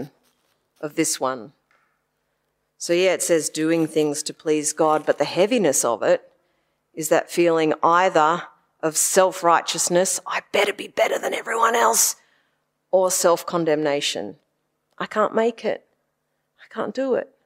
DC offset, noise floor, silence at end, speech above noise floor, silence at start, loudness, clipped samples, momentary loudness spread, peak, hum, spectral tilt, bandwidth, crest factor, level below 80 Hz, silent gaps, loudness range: under 0.1%; -74 dBFS; 0.2 s; 53 dB; 0 s; -21 LUFS; under 0.1%; 12 LU; -2 dBFS; none; -2.5 dB/octave; 16 kHz; 20 dB; -78 dBFS; none; 5 LU